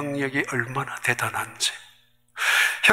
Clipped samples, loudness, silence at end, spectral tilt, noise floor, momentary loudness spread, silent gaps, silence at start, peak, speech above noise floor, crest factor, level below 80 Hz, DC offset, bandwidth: under 0.1%; -24 LUFS; 0 s; -2.5 dB/octave; -58 dBFS; 9 LU; none; 0 s; -2 dBFS; 31 dB; 24 dB; -66 dBFS; under 0.1%; 16 kHz